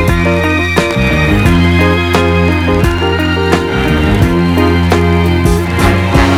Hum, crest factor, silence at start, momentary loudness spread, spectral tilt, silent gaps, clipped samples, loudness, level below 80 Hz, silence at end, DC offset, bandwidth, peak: none; 10 dB; 0 s; 3 LU; -6.5 dB/octave; none; 0.3%; -10 LUFS; -20 dBFS; 0 s; under 0.1%; 15.5 kHz; 0 dBFS